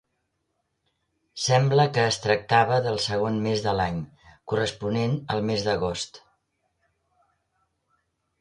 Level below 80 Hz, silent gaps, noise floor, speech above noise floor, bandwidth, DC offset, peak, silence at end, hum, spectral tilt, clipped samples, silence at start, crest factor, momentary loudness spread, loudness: -54 dBFS; none; -76 dBFS; 53 dB; 11.5 kHz; under 0.1%; -8 dBFS; 2.25 s; none; -5 dB/octave; under 0.1%; 1.35 s; 20 dB; 10 LU; -24 LUFS